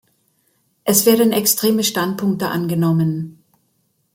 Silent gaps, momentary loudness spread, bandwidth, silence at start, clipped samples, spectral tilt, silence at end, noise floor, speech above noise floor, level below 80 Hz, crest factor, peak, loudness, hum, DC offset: none; 9 LU; 17 kHz; 0.85 s; under 0.1%; -4.5 dB/octave; 0.85 s; -65 dBFS; 49 dB; -60 dBFS; 18 dB; 0 dBFS; -17 LUFS; none; under 0.1%